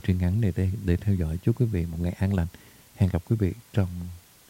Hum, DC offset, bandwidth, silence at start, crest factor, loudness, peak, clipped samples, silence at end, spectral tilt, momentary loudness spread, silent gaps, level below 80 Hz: none; under 0.1%; 16.5 kHz; 0.05 s; 16 dB; -27 LUFS; -10 dBFS; under 0.1%; 0.3 s; -8.5 dB/octave; 5 LU; none; -40 dBFS